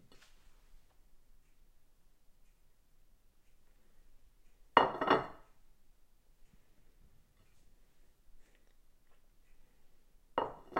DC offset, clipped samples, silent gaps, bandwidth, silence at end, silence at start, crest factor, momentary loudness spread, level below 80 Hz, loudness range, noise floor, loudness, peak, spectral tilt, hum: under 0.1%; under 0.1%; none; 16 kHz; 0 s; 4.15 s; 36 dB; 12 LU; -64 dBFS; 7 LU; -64 dBFS; -33 LUFS; -4 dBFS; -5.5 dB/octave; none